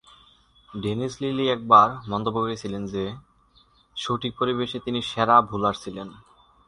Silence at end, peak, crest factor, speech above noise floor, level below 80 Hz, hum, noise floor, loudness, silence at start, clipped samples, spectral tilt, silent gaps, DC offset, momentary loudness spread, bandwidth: 0.5 s; -2 dBFS; 22 dB; 36 dB; -56 dBFS; none; -59 dBFS; -23 LUFS; 0.7 s; under 0.1%; -5.5 dB/octave; none; under 0.1%; 19 LU; 11.5 kHz